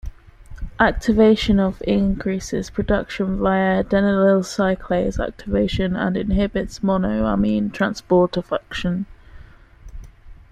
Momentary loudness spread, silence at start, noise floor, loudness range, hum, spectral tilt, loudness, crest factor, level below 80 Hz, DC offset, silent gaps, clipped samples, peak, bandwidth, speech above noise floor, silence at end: 9 LU; 0.05 s; -43 dBFS; 3 LU; none; -6.5 dB/octave; -20 LUFS; 18 dB; -34 dBFS; under 0.1%; none; under 0.1%; -2 dBFS; 9.6 kHz; 24 dB; 0.2 s